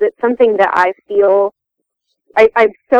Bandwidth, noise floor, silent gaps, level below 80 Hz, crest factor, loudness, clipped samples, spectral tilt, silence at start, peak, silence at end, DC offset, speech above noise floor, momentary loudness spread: 7.6 kHz; -76 dBFS; none; -52 dBFS; 14 dB; -13 LUFS; under 0.1%; -5.5 dB/octave; 0 s; 0 dBFS; 0 s; under 0.1%; 64 dB; 5 LU